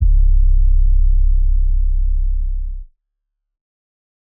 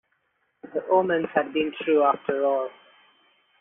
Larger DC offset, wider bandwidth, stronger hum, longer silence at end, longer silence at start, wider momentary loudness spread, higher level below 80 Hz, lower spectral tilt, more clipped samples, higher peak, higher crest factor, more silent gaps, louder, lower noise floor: neither; second, 0.2 kHz vs 3.8 kHz; neither; first, 1.35 s vs 0.9 s; second, 0 s vs 0.65 s; about the same, 10 LU vs 11 LU; first, -14 dBFS vs -70 dBFS; first, -25 dB/octave vs -3.5 dB/octave; neither; about the same, -6 dBFS vs -8 dBFS; second, 8 dB vs 18 dB; neither; first, -20 LUFS vs -24 LUFS; first, -76 dBFS vs -72 dBFS